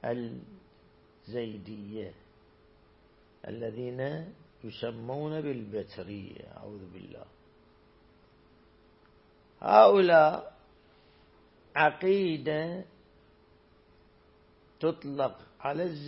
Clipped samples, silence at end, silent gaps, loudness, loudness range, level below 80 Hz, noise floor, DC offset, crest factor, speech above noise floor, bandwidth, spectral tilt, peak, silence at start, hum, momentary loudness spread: under 0.1%; 0 s; none; -28 LUFS; 18 LU; -68 dBFS; -62 dBFS; under 0.1%; 26 dB; 33 dB; 5.8 kHz; -9.5 dB/octave; -4 dBFS; 0 s; none; 26 LU